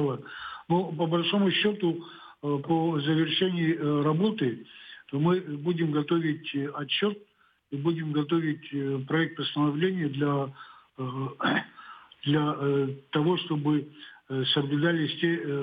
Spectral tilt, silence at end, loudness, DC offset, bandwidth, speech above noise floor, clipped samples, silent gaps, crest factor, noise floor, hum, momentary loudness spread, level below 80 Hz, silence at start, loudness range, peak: -9 dB/octave; 0 s; -28 LUFS; under 0.1%; 5 kHz; 20 dB; under 0.1%; none; 16 dB; -47 dBFS; none; 13 LU; -76 dBFS; 0 s; 3 LU; -12 dBFS